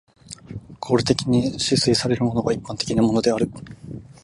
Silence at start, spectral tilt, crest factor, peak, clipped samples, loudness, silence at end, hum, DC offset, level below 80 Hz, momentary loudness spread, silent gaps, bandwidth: 0.3 s; -5 dB/octave; 20 dB; -2 dBFS; under 0.1%; -21 LUFS; 0.1 s; none; under 0.1%; -48 dBFS; 20 LU; none; 11.5 kHz